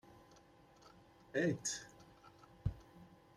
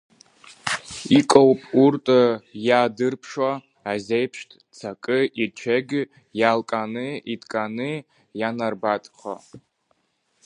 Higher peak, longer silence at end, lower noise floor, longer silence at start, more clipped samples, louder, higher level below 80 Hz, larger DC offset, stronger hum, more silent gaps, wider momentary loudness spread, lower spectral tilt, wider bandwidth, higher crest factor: second, -24 dBFS vs 0 dBFS; second, 0.3 s vs 0.85 s; second, -65 dBFS vs -70 dBFS; second, 0.1 s vs 0.65 s; neither; second, -41 LUFS vs -22 LUFS; first, -62 dBFS vs -68 dBFS; neither; neither; neither; first, 26 LU vs 17 LU; about the same, -4.5 dB/octave vs -5 dB/octave; first, 15 kHz vs 11.5 kHz; about the same, 22 dB vs 22 dB